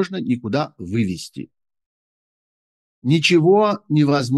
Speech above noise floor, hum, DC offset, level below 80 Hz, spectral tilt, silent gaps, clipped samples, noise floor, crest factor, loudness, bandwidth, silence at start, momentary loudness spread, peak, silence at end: over 72 dB; none; under 0.1%; -60 dBFS; -6 dB/octave; 1.86-3.02 s; under 0.1%; under -90 dBFS; 16 dB; -18 LUFS; 12.5 kHz; 0 s; 15 LU; -4 dBFS; 0 s